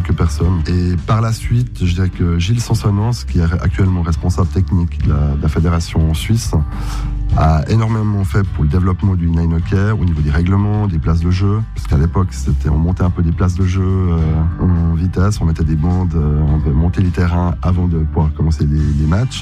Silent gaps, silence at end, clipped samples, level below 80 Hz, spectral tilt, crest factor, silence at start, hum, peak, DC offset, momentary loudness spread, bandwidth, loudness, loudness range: none; 0 s; under 0.1%; -22 dBFS; -7.5 dB/octave; 12 dB; 0 s; none; -2 dBFS; under 0.1%; 2 LU; 12.5 kHz; -16 LUFS; 1 LU